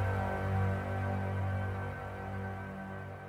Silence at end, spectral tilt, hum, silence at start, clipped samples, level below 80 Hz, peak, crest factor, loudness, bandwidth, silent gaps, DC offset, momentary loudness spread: 0 s; -8 dB/octave; none; 0 s; under 0.1%; -52 dBFS; -22 dBFS; 12 dB; -36 LUFS; 6.4 kHz; none; under 0.1%; 9 LU